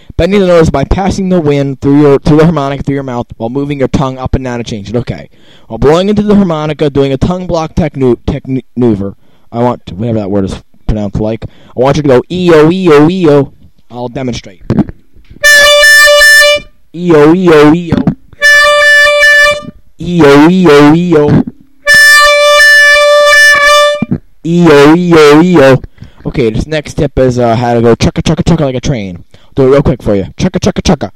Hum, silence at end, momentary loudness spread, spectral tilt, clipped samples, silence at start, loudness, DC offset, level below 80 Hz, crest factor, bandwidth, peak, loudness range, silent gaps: none; 0.05 s; 15 LU; -5 dB/octave; 1%; 0.2 s; -6 LUFS; under 0.1%; -26 dBFS; 6 dB; 18 kHz; 0 dBFS; 10 LU; none